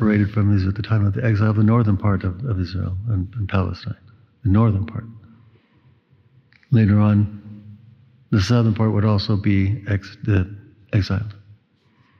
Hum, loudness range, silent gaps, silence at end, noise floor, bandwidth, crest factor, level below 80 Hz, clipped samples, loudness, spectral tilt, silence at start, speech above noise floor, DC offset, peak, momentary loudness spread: none; 4 LU; none; 0.85 s; -59 dBFS; 6.8 kHz; 14 dB; -50 dBFS; under 0.1%; -20 LUFS; -8.5 dB/octave; 0 s; 41 dB; under 0.1%; -6 dBFS; 13 LU